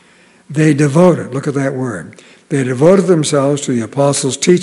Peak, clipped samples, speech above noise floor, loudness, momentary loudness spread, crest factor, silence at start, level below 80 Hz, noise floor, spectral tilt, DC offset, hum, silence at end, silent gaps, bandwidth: 0 dBFS; 0.4%; 34 dB; -13 LUFS; 11 LU; 14 dB; 0.5 s; -56 dBFS; -46 dBFS; -5.5 dB/octave; under 0.1%; none; 0 s; none; 11.5 kHz